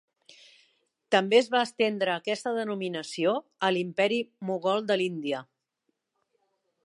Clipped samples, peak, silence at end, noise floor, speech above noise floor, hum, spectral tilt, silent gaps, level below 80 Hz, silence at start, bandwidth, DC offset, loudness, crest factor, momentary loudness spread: under 0.1%; -6 dBFS; 1.45 s; -80 dBFS; 52 dB; none; -4.5 dB/octave; none; -84 dBFS; 1.1 s; 11.5 kHz; under 0.1%; -27 LUFS; 22 dB; 10 LU